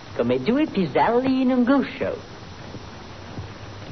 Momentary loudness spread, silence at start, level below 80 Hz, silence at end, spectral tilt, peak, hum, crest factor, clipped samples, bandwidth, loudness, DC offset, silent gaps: 19 LU; 0 s; -52 dBFS; 0 s; -7.5 dB/octave; -8 dBFS; none; 16 dB; under 0.1%; 6.4 kHz; -21 LUFS; 0.3%; none